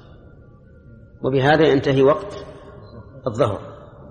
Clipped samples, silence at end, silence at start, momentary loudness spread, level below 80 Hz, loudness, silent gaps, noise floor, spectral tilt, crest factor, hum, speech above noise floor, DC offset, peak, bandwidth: under 0.1%; 0.05 s; 1.2 s; 26 LU; -48 dBFS; -18 LUFS; none; -46 dBFS; -7 dB/octave; 18 dB; none; 29 dB; under 0.1%; -2 dBFS; 9.6 kHz